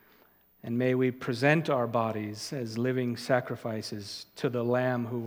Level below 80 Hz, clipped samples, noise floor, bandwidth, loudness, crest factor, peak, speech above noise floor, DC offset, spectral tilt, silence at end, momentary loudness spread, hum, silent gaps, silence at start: -76 dBFS; under 0.1%; -62 dBFS; 17 kHz; -30 LUFS; 22 dB; -8 dBFS; 33 dB; under 0.1%; -6 dB/octave; 0 s; 10 LU; none; none; 0.65 s